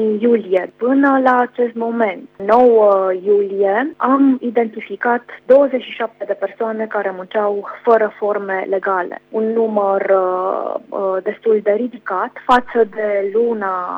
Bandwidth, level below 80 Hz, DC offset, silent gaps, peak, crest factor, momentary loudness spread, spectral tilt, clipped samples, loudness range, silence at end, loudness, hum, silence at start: 7.4 kHz; -60 dBFS; under 0.1%; none; -2 dBFS; 14 dB; 9 LU; -7.5 dB/octave; under 0.1%; 4 LU; 0 s; -16 LUFS; 50 Hz at -65 dBFS; 0 s